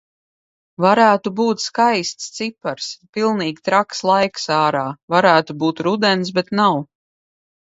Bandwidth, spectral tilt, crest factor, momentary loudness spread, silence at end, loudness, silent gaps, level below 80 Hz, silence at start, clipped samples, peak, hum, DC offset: 8 kHz; -4.5 dB/octave; 18 dB; 12 LU; 0.9 s; -18 LUFS; 3.09-3.13 s, 5.03-5.08 s; -66 dBFS; 0.8 s; under 0.1%; 0 dBFS; none; under 0.1%